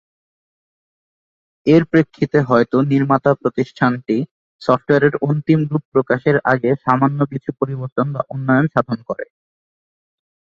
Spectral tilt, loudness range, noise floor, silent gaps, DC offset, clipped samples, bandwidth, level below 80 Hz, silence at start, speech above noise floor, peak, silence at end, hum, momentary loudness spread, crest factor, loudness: -9 dB/octave; 3 LU; under -90 dBFS; 4.31-4.59 s, 5.85-5.92 s, 7.92-7.96 s; under 0.1%; under 0.1%; 7.2 kHz; -56 dBFS; 1.65 s; over 74 dB; 0 dBFS; 1.2 s; none; 9 LU; 18 dB; -17 LUFS